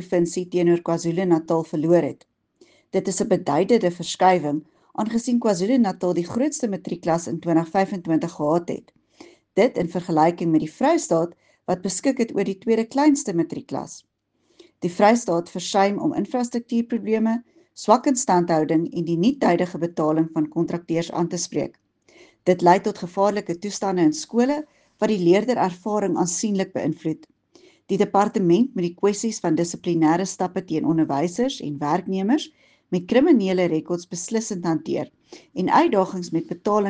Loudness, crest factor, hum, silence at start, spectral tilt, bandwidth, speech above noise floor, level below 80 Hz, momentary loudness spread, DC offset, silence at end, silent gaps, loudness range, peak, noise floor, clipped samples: -22 LUFS; 20 dB; none; 0 s; -5.5 dB/octave; 10 kHz; 45 dB; -64 dBFS; 10 LU; under 0.1%; 0 s; none; 2 LU; -2 dBFS; -67 dBFS; under 0.1%